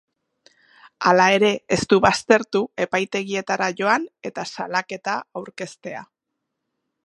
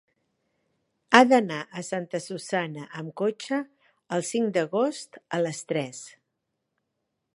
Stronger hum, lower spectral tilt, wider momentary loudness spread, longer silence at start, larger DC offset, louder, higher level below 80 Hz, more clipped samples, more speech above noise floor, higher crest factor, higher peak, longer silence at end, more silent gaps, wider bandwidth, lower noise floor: neither; about the same, -4 dB/octave vs -4.5 dB/octave; about the same, 17 LU vs 18 LU; about the same, 1 s vs 1.1 s; neither; first, -20 LUFS vs -26 LUFS; first, -56 dBFS vs -76 dBFS; neither; first, 59 dB vs 54 dB; second, 22 dB vs 28 dB; about the same, -2 dBFS vs 0 dBFS; second, 1 s vs 1.3 s; neither; about the same, 11.5 kHz vs 11.5 kHz; about the same, -80 dBFS vs -80 dBFS